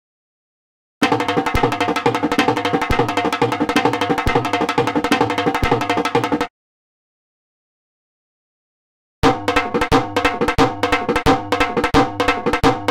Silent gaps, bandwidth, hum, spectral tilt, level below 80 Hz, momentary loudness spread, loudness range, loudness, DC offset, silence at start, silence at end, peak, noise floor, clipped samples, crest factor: 6.50-9.22 s; 17 kHz; none; -5 dB/octave; -34 dBFS; 2 LU; 7 LU; -18 LUFS; under 0.1%; 1 s; 0 s; -2 dBFS; under -90 dBFS; under 0.1%; 16 dB